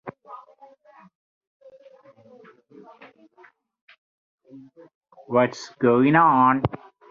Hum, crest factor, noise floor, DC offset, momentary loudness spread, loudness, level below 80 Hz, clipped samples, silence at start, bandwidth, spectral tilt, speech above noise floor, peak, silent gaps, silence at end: none; 20 dB; -55 dBFS; under 0.1%; 27 LU; -20 LUFS; -56 dBFS; under 0.1%; 0.05 s; 7.4 kHz; -7 dB/octave; 37 dB; -4 dBFS; 1.15-1.41 s, 1.47-1.60 s, 3.81-3.88 s, 3.98-4.38 s, 4.95-5.01 s; 0.35 s